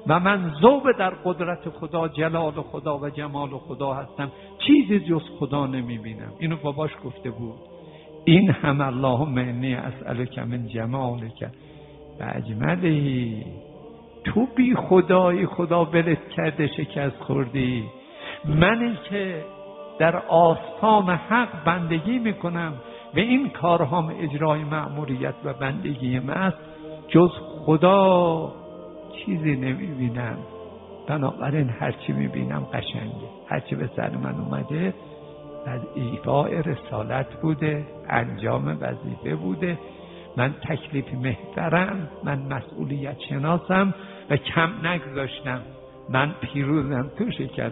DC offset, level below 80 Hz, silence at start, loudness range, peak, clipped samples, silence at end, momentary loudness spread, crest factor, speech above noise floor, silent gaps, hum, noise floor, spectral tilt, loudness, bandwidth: under 0.1%; -52 dBFS; 0 s; 7 LU; 0 dBFS; under 0.1%; 0 s; 17 LU; 24 dB; 21 dB; none; none; -44 dBFS; -11.5 dB/octave; -24 LUFS; 4 kHz